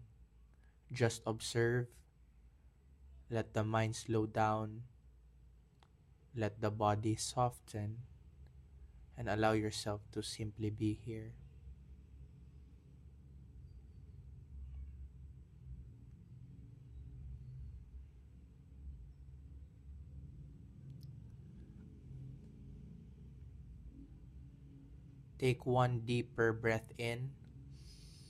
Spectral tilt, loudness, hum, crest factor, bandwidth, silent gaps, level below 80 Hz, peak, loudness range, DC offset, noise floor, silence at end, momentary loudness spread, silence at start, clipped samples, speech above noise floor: -5.5 dB/octave; -38 LUFS; none; 24 dB; 13.5 kHz; none; -58 dBFS; -18 dBFS; 17 LU; under 0.1%; -66 dBFS; 0 s; 24 LU; 0 s; under 0.1%; 29 dB